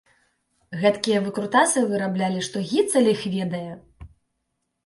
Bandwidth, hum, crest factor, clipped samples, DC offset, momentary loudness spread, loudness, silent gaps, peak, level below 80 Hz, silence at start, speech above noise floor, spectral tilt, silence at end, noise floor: 11.5 kHz; none; 20 dB; under 0.1%; under 0.1%; 12 LU; -22 LUFS; none; -4 dBFS; -58 dBFS; 0.7 s; 55 dB; -4.5 dB/octave; 0.8 s; -77 dBFS